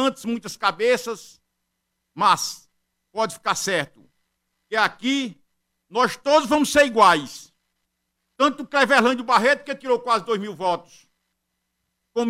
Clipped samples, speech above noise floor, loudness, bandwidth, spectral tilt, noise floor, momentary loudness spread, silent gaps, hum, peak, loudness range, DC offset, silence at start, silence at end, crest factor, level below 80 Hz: under 0.1%; 56 dB; -21 LUFS; 16 kHz; -3 dB/octave; -77 dBFS; 14 LU; none; none; -4 dBFS; 6 LU; under 0.1%; 0 s; 0 s; 18 dB; -62 dBFS